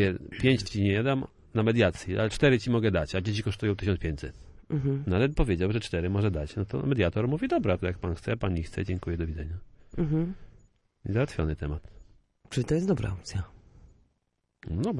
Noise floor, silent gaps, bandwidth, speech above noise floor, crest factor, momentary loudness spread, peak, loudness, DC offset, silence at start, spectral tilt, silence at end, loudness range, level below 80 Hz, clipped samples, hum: -77 dBFS; none; 11.5 kHz; 50 dB; 20 dB; 11 LU; -8 dBFS; -29 LUFS; under 0.1%; 0 s; -7 dB/octave; 0 s; 6 LU; -42 dBFS; under 0.1%; none